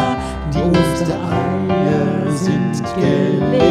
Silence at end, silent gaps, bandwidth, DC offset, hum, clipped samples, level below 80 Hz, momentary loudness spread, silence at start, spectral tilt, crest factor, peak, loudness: 0 s; none; 13.5 kHz; under 0.1%; none; under 0.1%; -34 dBFS; 5 LU; 0 s; -7 dB/octave; 14 dB; -2 dBFS; -17 LUFS